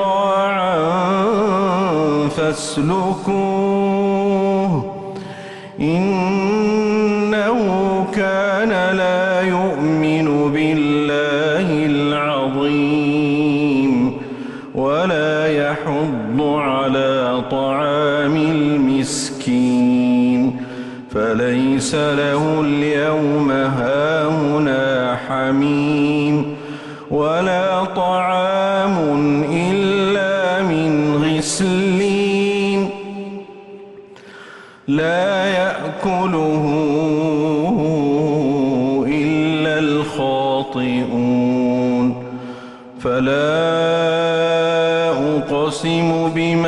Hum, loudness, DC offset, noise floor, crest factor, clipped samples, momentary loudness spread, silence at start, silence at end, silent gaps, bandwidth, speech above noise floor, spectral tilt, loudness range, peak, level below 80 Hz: none; -17 LUFS; under 0.1%; -39 dBFS; 10 dB; under 0.1%; 5 LU; 0 s; 0 s; none; 11.5 kHz; 22 dB; -6 dB/octave; 2 LU; -6 dBFS; -50 dBFS